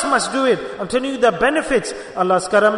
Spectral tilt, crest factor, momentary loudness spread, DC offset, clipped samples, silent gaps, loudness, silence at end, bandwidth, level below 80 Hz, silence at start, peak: -3.5 dB/octave; 16 dB; 7 LU; under 0.1%; under 0.1%; none; -18 LUFS; 0 s; 11 kHz; -48 dBFS; 0 s; -2 dBFS